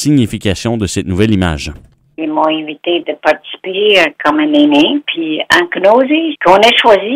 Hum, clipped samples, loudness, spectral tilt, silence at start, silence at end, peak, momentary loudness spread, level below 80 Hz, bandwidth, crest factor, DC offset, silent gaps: none; 0.4%; -11 LUFS; -5 dB/octave; 0 s; 0 s; 0 dBFS; 10 LU; -38 dBFS; 15.5 kHz; 12 dB; under 0.1%; none